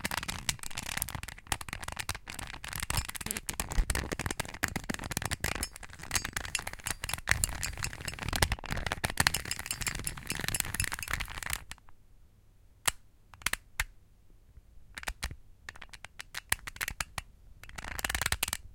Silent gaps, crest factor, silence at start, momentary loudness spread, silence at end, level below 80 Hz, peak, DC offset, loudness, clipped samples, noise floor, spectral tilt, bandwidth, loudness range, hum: none; 36 dB; 0 s; 12 LU; 0 s; -44 dBFS; 0 dBFS; under 0.1%; -34 LUFS; under 0.1%; -60 dBFS; -2 dB/octave; 17 kHz; 7 LU; none